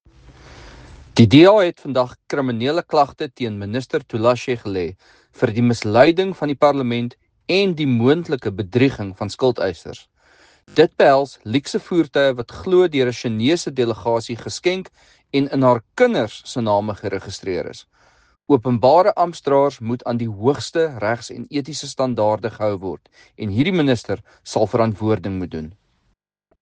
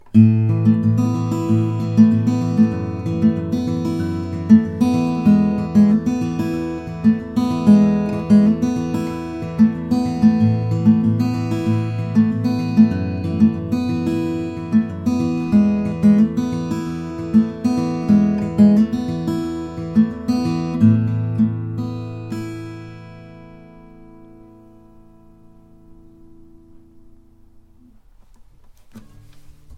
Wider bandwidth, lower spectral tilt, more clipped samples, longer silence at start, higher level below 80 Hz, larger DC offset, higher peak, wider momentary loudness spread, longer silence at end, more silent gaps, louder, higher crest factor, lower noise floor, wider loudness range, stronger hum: first, 9.6 kHz vs 8.2 kHz; second, -6.5 dB/octave vs -8.5 dB/octave; neither; first, 0.5 s vs 0.05 s; second, -54 dBFS vs -46 dBFS; neither; about the same, 0 dBFS vs 0 dBFS; about the same, 13 LU vs 11 LU; first, 0.9 s vs 0 s; neither; about the same, -19 LUFS vs -18 LUFS; about the same, 18 dB vs 18 dB; first, -67 dBFS vs -48 dBFS; about the same, 5 LU vs 4 LU; neither